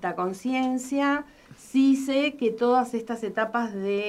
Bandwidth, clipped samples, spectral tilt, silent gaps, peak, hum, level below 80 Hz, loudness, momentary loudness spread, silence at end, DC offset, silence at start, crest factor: 13 kHz; under 0.1%; -5 dB/octave; none; -10 dBFS; none; -66 dBFS; -25 LUFS; 8 LU; 0 s; under 0.1%; 0 s; 14 dB